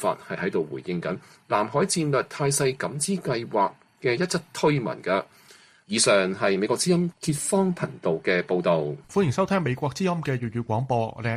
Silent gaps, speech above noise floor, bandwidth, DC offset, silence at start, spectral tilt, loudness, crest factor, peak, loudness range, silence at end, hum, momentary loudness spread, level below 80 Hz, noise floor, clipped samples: none; 29 dB; 15 kHz; under 0.1%; 0 s; -4.5 dB/octave; -25 LUFS; 18 dB; -8 dBFS; 2 LU; 0 s; none; 7 LU; -60 dBFS; -54 dBFS; under 0.1%